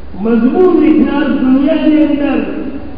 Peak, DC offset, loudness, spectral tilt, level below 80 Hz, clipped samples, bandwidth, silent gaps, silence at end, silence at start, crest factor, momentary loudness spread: 0 dBFS; 6%; -11 LUFS; -10 dB/octave; -34 dBFS; 0.2%; 5 kHz; none; 0 s; 0 s; 12 dB; 7 LU